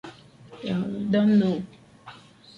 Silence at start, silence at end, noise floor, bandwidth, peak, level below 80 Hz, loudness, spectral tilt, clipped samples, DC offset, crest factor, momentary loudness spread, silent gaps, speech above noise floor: 0.05 s; 0.4 s; -48 dBFS; 7 kHz; -12 dBFS; -62 dBFS; -24 LUFS; -8.5 dB/octave; under 0.1%; under 0.1%; 16 dB; 20 LU; none; 25 dB